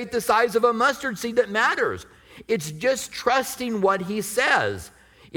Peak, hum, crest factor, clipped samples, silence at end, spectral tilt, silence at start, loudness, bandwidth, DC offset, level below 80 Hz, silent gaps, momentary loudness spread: -6 dBFS; none; 18 dB; under 0.1%; 0 s; -3.5 dB/octave; 0 s; -22 LUFS; 19.5 kHz; under 0.1%; -58 dBFS; none; 8 LU